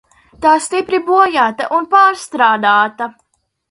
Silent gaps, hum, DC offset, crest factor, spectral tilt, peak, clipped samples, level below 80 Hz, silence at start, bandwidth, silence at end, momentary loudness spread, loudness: none; none; under 0.1%; 14 dB; -3 dB/octave; 0 dBFS; under 0.1%; -56 dBFS; 0.4 s; 11.5 kHz; 0.6 s; 7 LU; -13 LUFS